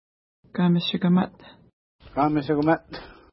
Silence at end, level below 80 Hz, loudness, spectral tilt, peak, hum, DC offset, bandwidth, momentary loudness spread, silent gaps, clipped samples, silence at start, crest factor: 0.2 s; -56 dBFS; -24 LUFS; -11 dB/octave; -6 dBFS; none; under 0.1%; 5.8 kHz; 13 LU; 1.73-1.99 s; under 0.1%; 0.55 s; 18 dB